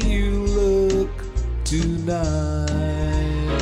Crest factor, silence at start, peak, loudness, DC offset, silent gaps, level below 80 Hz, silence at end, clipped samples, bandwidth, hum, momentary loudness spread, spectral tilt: 12 dB; 0 s; -8 dBFS; -22 LUFS; under 0.1%; none; -24 dBFS; 0 s; under 0.1%; 11.5 kHz; none; 6 LU; -6 dB/octave